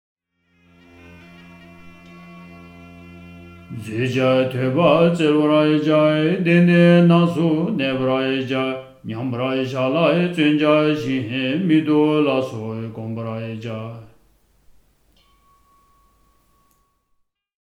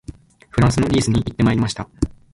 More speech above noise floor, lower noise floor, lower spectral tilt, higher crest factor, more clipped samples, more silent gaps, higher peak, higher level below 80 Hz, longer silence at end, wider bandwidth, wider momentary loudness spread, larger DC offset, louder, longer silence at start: first, 50 dB vs 22 dB; first, -68 dBFS vs -39 dBFS; first, -7.5 dB/octave vs -6 dB/octave; about the same, 18 dB vs 16 dB; neither; neither; about the same, -2 dBFS vs -2 dBFS; second, -60 dBFS vs -34 dBFS; first, 3.65 s vs 0.2 s; about the same, 10.5 kHz vs 11.5 kHz; first, 15 LU vs 9 LU; neither; about the same, -18 LUFS vs -19 LUFS; first, 1.15 s vs 0.1 s